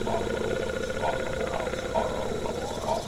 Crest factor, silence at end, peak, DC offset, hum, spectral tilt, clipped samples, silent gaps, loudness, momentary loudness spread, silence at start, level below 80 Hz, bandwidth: 16 dB; 0 s; -14 dBFS; 0.5%; none; -5 dB/octave; under 0.1%; none; -30 LUFS; 2 LU; 0 s; -42 dBFS; 16 kHz